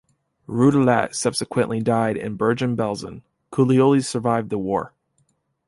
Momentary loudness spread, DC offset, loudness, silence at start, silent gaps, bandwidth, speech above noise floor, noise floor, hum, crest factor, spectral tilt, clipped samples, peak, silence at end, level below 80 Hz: 11 LU; under 0.1%; -21 LUFS; 0.5 s; none; 11.5 kHz; 47 dB; -67 dBFS; none; 18 dB; -6 dB/octave; under 0.1%; -4 dBFS; 0.8 s; -56 dBFS